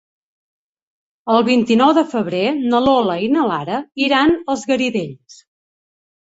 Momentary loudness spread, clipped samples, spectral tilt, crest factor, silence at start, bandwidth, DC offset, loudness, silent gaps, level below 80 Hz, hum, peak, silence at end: 9 LU; under 0.1%; -5 dB/octave; 16 dB; 1.25 s; 8 kHz; under 0.1%; -16 LUFS; none; -54 dBFS; none; -2 dBFS; 0.9 s